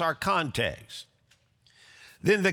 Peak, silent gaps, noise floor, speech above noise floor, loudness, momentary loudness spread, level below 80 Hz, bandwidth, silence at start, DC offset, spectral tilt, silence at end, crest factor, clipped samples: -12 dBFS; none; -66 dBFS; 39 dB; -27 LUFS; 18 LU; -58 dBFS; over 20 kHz; 0 s; under 0.1%; -4.5 dB/octave; 0 s; 18 dB; under 0.1%